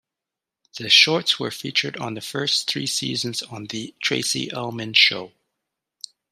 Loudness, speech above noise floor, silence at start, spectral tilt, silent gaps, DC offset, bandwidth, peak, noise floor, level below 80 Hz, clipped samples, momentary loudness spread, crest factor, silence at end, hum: -20 LUFS; 64 dB; 0.75 s; -2 dB/octave; none; under 0.1%; 15.5 kHz; 0 dBFS; -87 dBFS; -70 dBFS; under 0.1%; 18 LU; 24 dB; 1.05 s; none